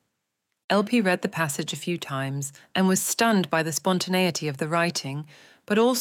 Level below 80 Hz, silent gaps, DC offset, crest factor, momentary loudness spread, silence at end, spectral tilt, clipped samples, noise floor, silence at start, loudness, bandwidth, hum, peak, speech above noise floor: -76 dBFS; none; under 0.1%; 18 dB; 9 LU; 0 s; -4 dB/octave; under 0.1%; -80 dBFS; 0.7 s; -25 LUFS; 17.5 kHz; none; -8 dBFS; 55 dB